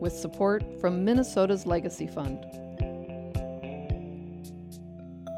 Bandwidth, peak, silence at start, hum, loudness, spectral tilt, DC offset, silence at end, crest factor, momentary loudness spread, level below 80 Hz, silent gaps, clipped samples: 15.5 kHz; -12 dBFS; 0 s; none; -30 LUFS; -6.5 dB/octave; under 0.1%; 0 s; 18 dB; 18 LU; -44 dBFS; none; under 0.1%